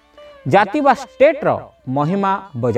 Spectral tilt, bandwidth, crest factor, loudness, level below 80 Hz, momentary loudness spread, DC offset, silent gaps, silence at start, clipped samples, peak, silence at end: -7 dB/octave; 9.4 kHz; 16 dB; -17 LUFS; -56 dBFS; 10 LU; under 0.1%; none; 0.2 s; under 0.1%; 0 dBFS; 0 s